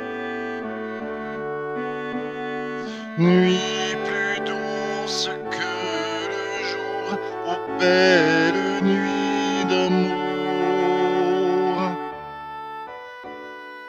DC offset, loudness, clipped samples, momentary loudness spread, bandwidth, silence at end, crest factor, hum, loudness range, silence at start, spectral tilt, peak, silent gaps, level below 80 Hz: under 0.1%; -23 LUFS; under 0.1%; 15 LU; 9 kHz; 0 s; 20 dB; none; 6 LU; 0 s; -5 dB/octave; -2 dBFS; none; -64 dBFS